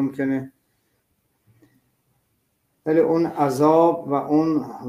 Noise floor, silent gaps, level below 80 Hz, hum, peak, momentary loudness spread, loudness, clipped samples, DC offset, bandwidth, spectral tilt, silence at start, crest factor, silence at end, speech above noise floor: -70 dBFS; none; -66 dBFS; none; -4 dBFS; 11 LU; -20 LUFS; under 0.1%; under 0.1%; 15.5 kHz; -7.5 dB/octave; 0 s; 18 dB; 0 s; 50 dB